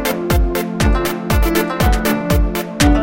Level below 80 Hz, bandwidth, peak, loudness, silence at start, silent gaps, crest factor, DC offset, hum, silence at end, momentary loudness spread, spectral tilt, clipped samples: -18 dBFS; 17 kHz; 0 dBFS; -17 LUFS; 0 s; none; 14 dB; 0.5%; none; 0 s; 3 LU; -5.5 dB/octave; under 0.1%